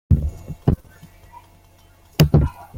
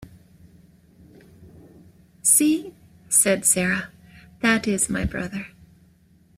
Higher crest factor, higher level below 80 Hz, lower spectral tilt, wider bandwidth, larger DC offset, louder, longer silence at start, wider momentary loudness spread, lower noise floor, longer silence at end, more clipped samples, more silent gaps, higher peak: about the same, 20 dB vs 22 dB; first, -30 dBFS vs -48 dBFS; first, -7 dB/octave vs -3 dB/octave; about the same, 16.5 kHz vs 16 kHz; neither; about the same, -20 LUFS vs -20 LUFS; about the same, 0.1 s vs 0 s; second, 12 LU vs 18 LU; second, -51 dBFS vs -56 dBFS; second, 0 s vs 0.9 s; neither; neither; about the same, -2 dBFS vs -4 dBFS